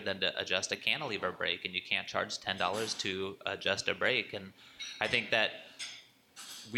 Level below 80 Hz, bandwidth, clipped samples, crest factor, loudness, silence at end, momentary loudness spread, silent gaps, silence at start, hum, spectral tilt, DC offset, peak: -72 dBFS; 16.5 kHz; under 0.1%; 22 dB; -33 LUFS; 0 s; 14 LU; none; 0 s; none; -2 dB/octave; under 0.1%; -14 dBFS